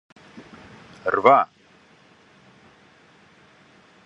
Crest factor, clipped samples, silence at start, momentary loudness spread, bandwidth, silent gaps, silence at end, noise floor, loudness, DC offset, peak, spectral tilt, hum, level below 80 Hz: 26 dB; under 0.1%; 0.35 s; 29 LU; 7.8 kHz; none; 2.6 s; -55 dBFS; -19 LUFS; under 0.1%; -2 dBFS; -6 dB/octave; none; -68 dBFS